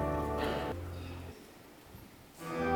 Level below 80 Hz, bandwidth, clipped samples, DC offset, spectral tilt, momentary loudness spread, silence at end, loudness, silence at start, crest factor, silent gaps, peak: -50 dBFS; 19 kHz; under 0.1%; under 0.1%; -6 dB/octave; 19 LU; 0 s; -38 LUFS; 0 s; 18 dB; none; -20 dBFS